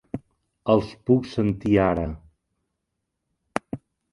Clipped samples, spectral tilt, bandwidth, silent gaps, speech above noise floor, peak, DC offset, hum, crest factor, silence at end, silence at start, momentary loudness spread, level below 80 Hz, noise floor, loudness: under 0.1%; -8 dB/octave; 11.5 kHz; none; 58 dB; -2 dBFS; under 0.1%; none; 24 dB; 0.35 s; 0.15 s; 18 LU; -46 dBFS; -80 dBFS; -24 LUFS